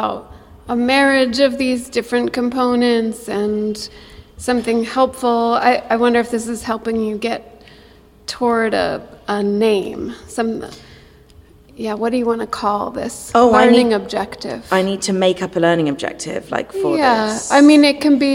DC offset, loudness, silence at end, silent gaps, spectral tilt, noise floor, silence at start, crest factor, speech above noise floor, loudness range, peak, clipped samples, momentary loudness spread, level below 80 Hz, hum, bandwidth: under 0.1%; -16 LUFS; 0 s; none; -4.5 dB/octave; -45 dBFS; 0 s; 16 dB; 29 dB; 6 LU; -2 dBFS; under 0.1%; 14 LU; -48 dBFS; none; 16 kHz